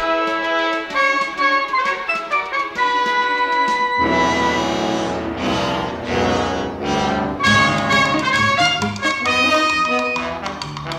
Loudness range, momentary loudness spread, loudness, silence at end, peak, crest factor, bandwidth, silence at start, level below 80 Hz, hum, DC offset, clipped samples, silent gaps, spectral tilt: 3 LU; 7 LU; -18 LUFS; 0 s; -4 dBFS; 14 dB; 15 kHz; 0 s; -44 dBFS; none; under 0.1%; under 0.1%; none; -4 dB/octave